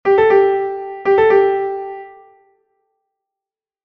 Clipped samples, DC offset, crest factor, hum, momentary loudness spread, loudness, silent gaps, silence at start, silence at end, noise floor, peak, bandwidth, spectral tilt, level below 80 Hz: under 0.1%; under 0.1%; 16 dB; none; 16 LU; -14 LUFS; none; 0.05 s; 1.75 s; -88 dBFS; -2 dBFS; 5.2 kHz; -7 dB/octave; -56 dBFS